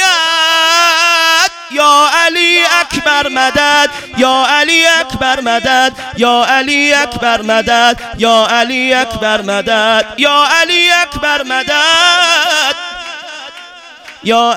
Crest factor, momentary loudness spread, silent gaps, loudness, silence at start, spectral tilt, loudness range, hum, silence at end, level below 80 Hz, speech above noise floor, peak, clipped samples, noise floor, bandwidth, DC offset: 10 dB; 7 LU; none; -9 LUFS; 0 s; -1.5 dB/octave; 2 LU; none; 0 s; -42 dBFS; 23 dB; 0 dBFS; 0.9%; -33 dBFS; over 20 kHz; under 0.1%